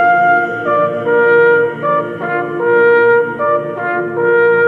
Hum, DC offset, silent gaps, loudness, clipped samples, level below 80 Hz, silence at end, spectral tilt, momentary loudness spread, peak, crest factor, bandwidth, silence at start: none; under 0.1%; none; -13 LUFS; under 0.1%; -58 dBFS; 0 s; -8 dB/octave; 8 LU; 0 dBFS; 12 dB; 4.5 kHz; 0 s